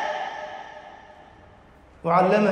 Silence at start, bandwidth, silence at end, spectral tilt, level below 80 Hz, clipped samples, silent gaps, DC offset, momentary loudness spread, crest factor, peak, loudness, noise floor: 0 s; 10 kHz; 0 s; -7 dB/octave; -60 dBFS; under 0.1%; none; under 0.1%; 25 LU; 20 dB; -6 dBFS; -23 LUFS; -51 dBFS